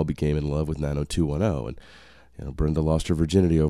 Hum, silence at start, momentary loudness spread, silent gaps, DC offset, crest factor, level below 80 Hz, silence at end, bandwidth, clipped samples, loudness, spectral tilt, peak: none; 0 s; 15 LU; none; 0.2%; 18 dB; -34 dBFS; 0 s; 12.5 kHz; under 0.1%; -25 LUFS; -7.5 dB/octave; -6 dBFS